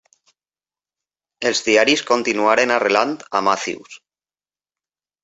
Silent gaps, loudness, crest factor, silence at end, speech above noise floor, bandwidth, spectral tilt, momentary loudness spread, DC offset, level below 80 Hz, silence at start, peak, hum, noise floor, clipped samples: none; -17 LUFS; 20 dB; 1.25 s; over 72 dB; 8.2 kHz; -2 dB/octave; 8 LU; under 0.1%; -64 dBFS; 1.4 s; -2 dBFS; none; under -90 dBFS; under 0.1%